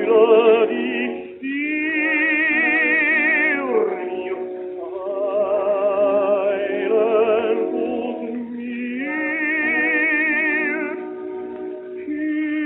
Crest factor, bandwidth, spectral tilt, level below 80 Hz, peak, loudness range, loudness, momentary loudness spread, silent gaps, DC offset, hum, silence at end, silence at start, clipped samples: 16 dB; 4.1 kHz; -8 dB/octave; -66 dBFS; -2 dBFS; 3 LU; -19 LUFS; 14 LU; none; under 0.1%; none; 0 s; 0 s; under 0.1%